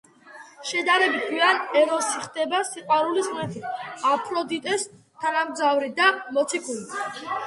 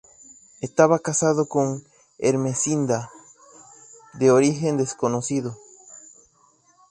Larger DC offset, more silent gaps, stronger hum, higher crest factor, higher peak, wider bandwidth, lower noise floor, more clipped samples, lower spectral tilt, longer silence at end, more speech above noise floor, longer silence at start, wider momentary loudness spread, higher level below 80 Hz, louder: neither; neither; neither; about the same, 20 dB vs 22 dB; about the same, -4 dBFS vs -2 dBFS; about the same, 11.5 kHz vs 11 kHz; second, -47 dBFS vs -60 dBFS; neither; second, -2.5 dB/octave vs -5.5 dB/octave; second, 0 s vs 0.95 s; second, 23 dB vs 39 dB; second, 0.25 s vs 0.6 s; second, 11 LU vs 24 LU; second, -72 dBFS vs -64 dBFS; about the same, -24 LUFS vs -22 LUFS